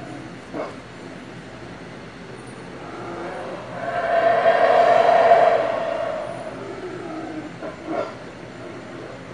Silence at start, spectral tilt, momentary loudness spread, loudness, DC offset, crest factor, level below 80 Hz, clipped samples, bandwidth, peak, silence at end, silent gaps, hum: 0 s; -5.5 dB/octave; 22 LU; -20 LUFS; 0.2%; 20 dB; -58 dBFS; under 0.1%; 10.5 kHz; -2 dBFS; 0 s; none; none